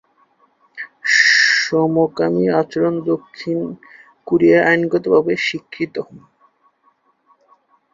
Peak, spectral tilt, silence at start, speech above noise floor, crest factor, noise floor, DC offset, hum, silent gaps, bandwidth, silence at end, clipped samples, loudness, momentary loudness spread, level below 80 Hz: -2 dBFS; -4.5 dB/octave; 0.75 s; 43 dB; 16 dB; -60 dBFS; under 0.1%; none; none; 7.6 kHz; 1.75 s; under 0.1%; -16 LUFS; 16 LU; -60 dBFS